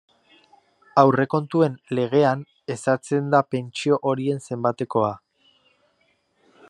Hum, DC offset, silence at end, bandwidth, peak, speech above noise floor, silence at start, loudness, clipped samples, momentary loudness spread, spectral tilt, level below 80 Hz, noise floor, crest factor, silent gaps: none; under 0.1%; 1.5 s; 10.5 kHz; -2 dBFS; 45 dB; 0.95 s; -22 LUFS; under 0.1%; 9 LU; -6.5 dB/octave; -72 dBFS; -66 dBFS; 22 dB; none